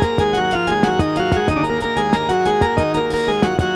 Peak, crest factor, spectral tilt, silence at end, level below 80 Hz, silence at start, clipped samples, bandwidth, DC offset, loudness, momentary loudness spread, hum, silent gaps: -4 dBFS; 14 dB; -6 dB/octave; 0 s; -34 dBFS; 0 s; under 0.1%; 12.5 kHz; under 0.1%; -18 LUFS; 2 LU; none; none